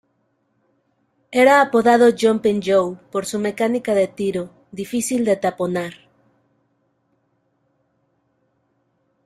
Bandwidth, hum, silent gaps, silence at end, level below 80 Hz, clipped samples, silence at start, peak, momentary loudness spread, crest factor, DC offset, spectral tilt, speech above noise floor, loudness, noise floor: 15 kHz; none; none; 3.3 s; -62 dBFS; under 0.1%; 1.3 s; -2 dBFS; 13 LU; 18 dB; under 0.1%; -4.5 dB/octave; 50 dB; -18 LUFS; -67 dBFS